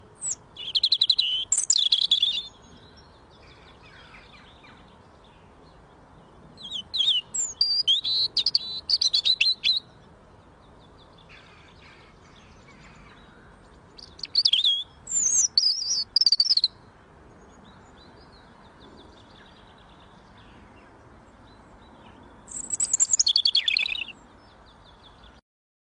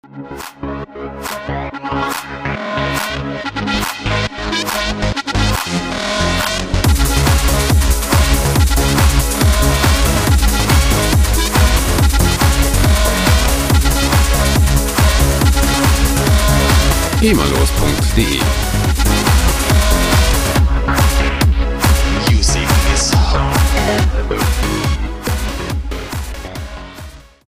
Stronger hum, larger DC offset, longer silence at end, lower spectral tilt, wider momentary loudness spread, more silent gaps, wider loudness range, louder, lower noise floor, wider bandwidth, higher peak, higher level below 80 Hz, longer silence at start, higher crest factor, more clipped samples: neither; neither; first, 1.75 s vs 0.3 s; second, 2 dB/octave vs -4.5 dB/octave; first, 13 LU vs 10 LU; neither; first, 9 LU vs 6 LU; second, -21 LUFS vs -14 LUFS; first, -52 dBFS vs -34 dBFS; second, 10.5 kHz vs 16 kHz; second, -6 dBFS vs 0 dBFS; second, -60 dBFS vs -16 dBFS; about the same, 0.2 s vs 0.15 s; first, 22 dB vs 14 dB; neither